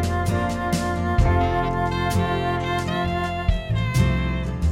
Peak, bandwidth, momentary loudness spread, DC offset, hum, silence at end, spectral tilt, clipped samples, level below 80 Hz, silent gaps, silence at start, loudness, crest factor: -6 dBFS; 16 kHz; 4 LU; under 0.1%; none; 0 s; -6.5 dB/octave; under 0.1%; -28 dBFS; none; 0 s; -23 LUFS; 16 dB